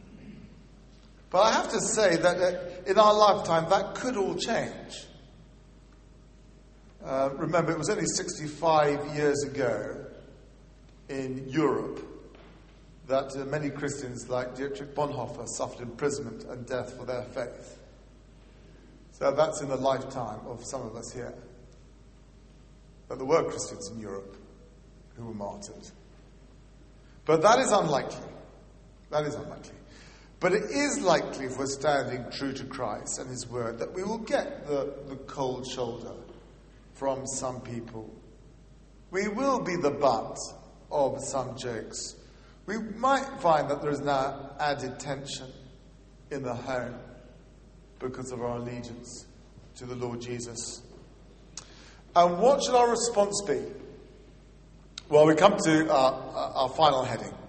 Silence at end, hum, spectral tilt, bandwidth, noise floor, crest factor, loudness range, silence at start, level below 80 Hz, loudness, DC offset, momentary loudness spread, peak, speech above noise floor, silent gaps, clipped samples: 0 s; none; -4 dB/octave; 8.8 kHz; -53 dBFS; 24 dB; 12 LU; 0 s; -54 dBFS; -28 LUFS; under 0.1%; 20 LU; -6 dBFS; 25 dB; none; under 0.1%